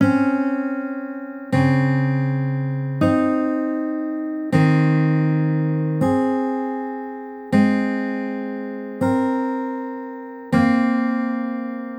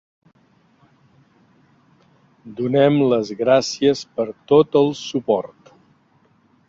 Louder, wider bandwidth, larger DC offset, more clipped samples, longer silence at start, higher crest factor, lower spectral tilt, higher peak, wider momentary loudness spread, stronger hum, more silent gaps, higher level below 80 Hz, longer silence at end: second, -21 LUFS vs -18 LUFS; first, 10 kHz vs 7.8 kHz; neither; neither; second, 0 s vs 2.45 s; about the same, 16 dB vs 18 dB; first, -9 dB/octave vs -6 dB/octave; about the same, -4 dBFS vs -2 dBFS; about the same, 12 LU vs 11 LU; neither; neither; about the same, -58 dBFS vs -62 dBFS; second, 0 s vs 1.2 s